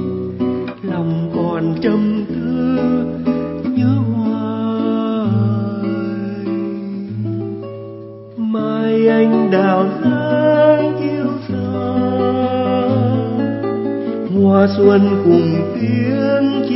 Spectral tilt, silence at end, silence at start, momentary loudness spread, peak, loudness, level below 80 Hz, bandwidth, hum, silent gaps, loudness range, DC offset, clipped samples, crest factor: -12.5 dB/octave; 0 s; 0 s; 11 LU; 0 dBFS; -16 LUFS; -52 dBFS; 5.8 kHz; none; none; 6 LU; under 0.1%; under 0.1%; 16 dB